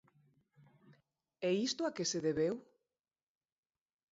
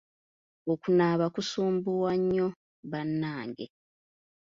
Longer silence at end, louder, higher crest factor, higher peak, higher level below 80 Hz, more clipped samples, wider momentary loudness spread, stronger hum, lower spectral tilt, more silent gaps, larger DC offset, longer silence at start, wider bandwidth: first, 1.5 s vs 0.85 s; second, -36 LUFS vs -29 LUFS; about the same, 18 dB vs 18 dB; second, -24 dBFS vs -12 dBFS; second, -76 dBFS vs -68 dBFS; neither; second, 5 LU vs 15 LU; neither; second, -4.5 dB/octave vs -6.5 dB/octave; second, none vs 2.56-2.83 s; neither; first, 0.9 s vs 0.65 s; about the same, 7.6 kHz vs 7.6 kHz